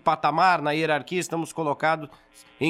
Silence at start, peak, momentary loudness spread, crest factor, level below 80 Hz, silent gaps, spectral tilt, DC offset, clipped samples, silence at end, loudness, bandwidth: 0.05 s; -8 dBFS; 9 LU; 18 dB; -68 dBFS; none; -4.5 dB/octave; under 0.1%; under 0.1%; 0 s; -24 LUFS; 15 kHz